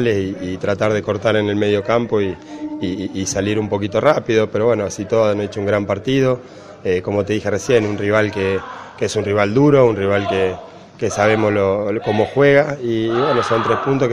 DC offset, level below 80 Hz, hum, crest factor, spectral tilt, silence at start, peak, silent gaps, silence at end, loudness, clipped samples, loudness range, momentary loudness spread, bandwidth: under 0.1%; -50 dBFS; none; 18 dB; -6 dB/octave; 0 s; 0 dBFS; none; 0 s; -17 LUFS; under 0.1%; 3 LU; 9 LU; 11.5 kHz